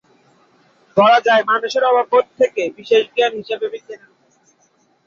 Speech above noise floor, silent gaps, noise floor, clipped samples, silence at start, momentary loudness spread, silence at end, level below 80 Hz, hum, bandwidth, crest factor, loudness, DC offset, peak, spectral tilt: 43 dB; none; -59 dBFS; under 0.1%; 0.95 s; 12 LU; 1.1 s; -68 dBFS; none; 7.4 kHz; 16 dB; -16 LUFS; under 0.1%; -2 dBFS; -4 dB/octave